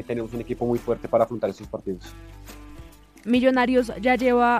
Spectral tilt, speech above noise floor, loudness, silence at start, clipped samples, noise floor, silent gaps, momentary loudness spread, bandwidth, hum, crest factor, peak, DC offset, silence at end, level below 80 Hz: -6 dB/octave; 23 dB; -23 LUFS; 0 s; under 0.1%; -45 dBFS; none; 24 LU; 15 kHz; none; 18 dB; -6 dBFS; under 0.1%; 0 s; -46 dBFS